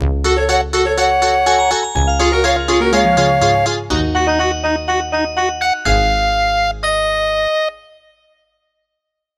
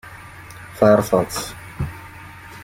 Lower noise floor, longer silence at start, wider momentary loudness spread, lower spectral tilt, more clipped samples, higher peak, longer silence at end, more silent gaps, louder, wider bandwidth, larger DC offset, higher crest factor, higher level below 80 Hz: first, -78 dBFS vs -39 dBFS; about the same, 0 s vs 0.05 s; second, 5 LU vs 23 LU; second, -4 dB/octave vs -5.5 dB/octave; neither; about the same, 0 dBFS vs -2 dBFS; first, 1.6 s vs 0 s; neither; first, -15 LUFS vs -19 LUFS; second, 13.5 kHz vs 16.5 kHz; neither; second, 14 dB vs 20 dB; first, -24 dBFS vs -46 dBFS